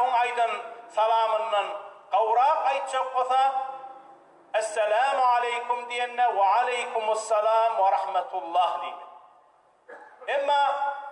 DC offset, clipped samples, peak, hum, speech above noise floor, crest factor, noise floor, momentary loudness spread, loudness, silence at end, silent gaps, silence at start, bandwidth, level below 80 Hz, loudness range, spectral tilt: under 0.1%; under 0.1%; -12 dBFS; none; 36 dB; 12 dB; -60 dBFS; 11 LU; -25 LUFS; 0 s; none; 0 s; 11 kHz; under -90 dBFS; 3 LU; 0 dB/octave